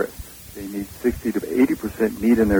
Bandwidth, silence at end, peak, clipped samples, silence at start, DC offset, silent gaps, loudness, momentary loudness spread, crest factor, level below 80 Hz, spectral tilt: over 20 kHz; 0 s; -6 dBFS; under 0.1%; 0 s; under 0.1%; none; -23 LUFS; 16 LU; 16 dB; -42 dBFS; -6.5 dB/octave